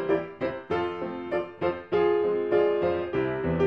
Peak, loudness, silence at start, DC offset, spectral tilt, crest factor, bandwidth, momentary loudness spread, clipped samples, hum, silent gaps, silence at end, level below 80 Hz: -12 dBFS; -27 LUFS; 0 s; under 0.1%; -8.5 dB/octave; 14 dB; 5.8 kHz; 8 LU; under 0.1%; none; none; 0 s; -54 dBFS